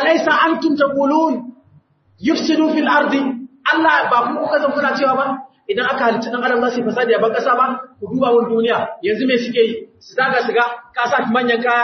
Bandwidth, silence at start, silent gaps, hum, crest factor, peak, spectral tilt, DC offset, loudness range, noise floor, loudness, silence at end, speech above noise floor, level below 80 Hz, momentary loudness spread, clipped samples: 6.4 kHz; 0 s; none; none; 16 dB; -2 dBFS; -5 dB/octave; under 0.1%; 1 LU; -53 dBFS; -16 LUFS; 0 s; 36 dB; -68 dBFS; 8 LU; under 0.1%